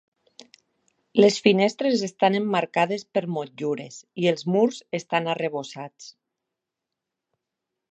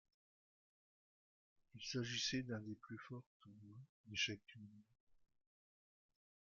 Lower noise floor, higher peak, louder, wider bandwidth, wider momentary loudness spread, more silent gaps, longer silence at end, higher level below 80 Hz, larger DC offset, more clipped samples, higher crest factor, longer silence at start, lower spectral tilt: second, -85 dBFS vs under -90 dBFS; first, -2 dBFS vs -28 dBFS; first, -23 LUFS vs -45 LUFS; first, 8.6 kHz vs 7.4 kHz; second, 13 LU vs 22 LU; second, none vs 3.26-3.40 s, 3.89-4.04 s, 5.00-5.07 s; first, 1.8 s vs 1.4 s; about the same, -78 dBFS vs -80 dBFS; neither; neither; about the same, 24 dB vs 24 dB; second, 1.15 s vs 1.75 s; first, -5 dB/octave vs -3.5 dB/octave